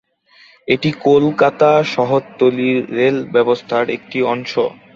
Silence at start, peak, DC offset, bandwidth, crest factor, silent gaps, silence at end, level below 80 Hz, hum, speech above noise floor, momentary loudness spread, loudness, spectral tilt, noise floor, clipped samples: 0.7 s; 0 dBFS; under 0.1%; 7.6 kHz; 16 dB; none; 0.25 s; -58 dBFS; none; 34 dB; 7 LU; -16 LUFS; -6.5 dB/octave; -49 dBFS; under 0.1%